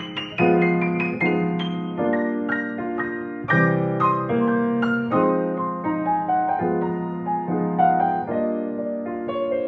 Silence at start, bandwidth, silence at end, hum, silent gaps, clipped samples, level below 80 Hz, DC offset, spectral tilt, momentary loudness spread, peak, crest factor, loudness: 0 s; 6 kHz; 0 s; none; none; under 0.1%; -60 dBFS; under 0.1%; -9 dB/octave; 8 LU; -6 dBFS; 16 dB; -22 LUFS